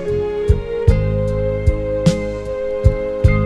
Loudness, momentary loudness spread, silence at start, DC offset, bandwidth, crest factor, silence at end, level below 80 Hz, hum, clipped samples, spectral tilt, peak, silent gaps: -18 LUFS; 6 LU; 0 s; under 0.1%; 11 kHz; 16 dB; 0 s; -22 dBFS; none; under 0.1%; -8 dB/octave; 0 dBFS; none